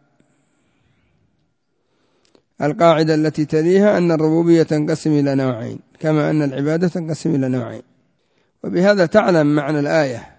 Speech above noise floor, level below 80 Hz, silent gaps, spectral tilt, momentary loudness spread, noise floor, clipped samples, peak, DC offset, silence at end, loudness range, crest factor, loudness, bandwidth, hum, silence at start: 52 dB; -58 dBFS; none; -7 dB/octave; 10 LU; -68 dBFS; under 0.1%; 0 dBFS; under 0.1%; 0.15 s; 5 LU; 18 dB; -17 LUFS; 8 kHz; none; 2.6 s